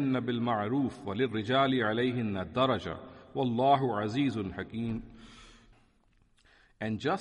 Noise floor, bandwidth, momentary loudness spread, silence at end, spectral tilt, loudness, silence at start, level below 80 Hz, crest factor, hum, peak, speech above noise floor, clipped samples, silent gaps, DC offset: -67 dBFS; 10 kHz; 13 LU; 0 s; -7 dB/octave; -31 LUFS; 0 s; -60 dBFS; 18 dB; none; -14 dBFS; 37 dB; under 0.1%; none; under 0.1%